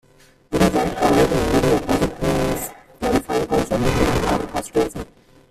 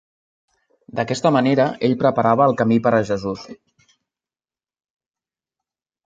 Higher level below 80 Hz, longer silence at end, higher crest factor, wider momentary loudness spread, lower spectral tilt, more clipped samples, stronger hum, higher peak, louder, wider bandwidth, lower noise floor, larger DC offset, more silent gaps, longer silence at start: first, -34 dBFS vs -58 dBFS; second, 0.45 s vs 2.55 s; about the same, 16 dB vs 20 dB; about the same, 10 LU vs 11 LU; second, -5.5 dB/octave vs -7 dB/octave; neither; neither; about the same, -4 dBFS vs -2 dBFS; about the same, -20 LUFS vs -18 LUFS; first, 16 kHz vs 7.8 kHz; second, -49 dBFS vs under -90 dBFS; neither; neither; second, 0.5 s vs 0.95 s